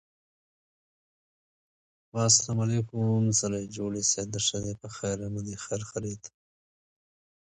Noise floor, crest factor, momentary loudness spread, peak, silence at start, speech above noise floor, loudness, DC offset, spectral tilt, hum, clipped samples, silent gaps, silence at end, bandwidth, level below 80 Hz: under -90 dBFS; 24 dB; 14 LU; -8 dBFS; 2.15 s; over 61 dB; -28 LUFS; under 0.1%; -4 dB/octave; none; under 0.1%; none; 1.15 s; 10 kHz; -58 dBFS